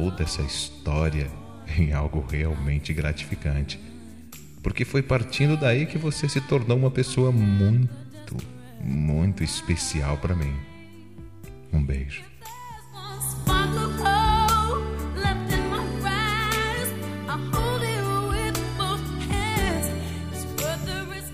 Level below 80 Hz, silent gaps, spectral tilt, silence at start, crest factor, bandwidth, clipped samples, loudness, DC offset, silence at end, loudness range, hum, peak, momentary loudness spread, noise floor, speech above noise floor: -34 dBFS; none; -5.5 dB/octave; 0 s; 16 dB; 15.5 kHz; under 0.1%; -25 LUFS; 0.4%; 0 s; 5 LU; none; -8 dBFS; 18 LU; -45 dBFS; 21 dB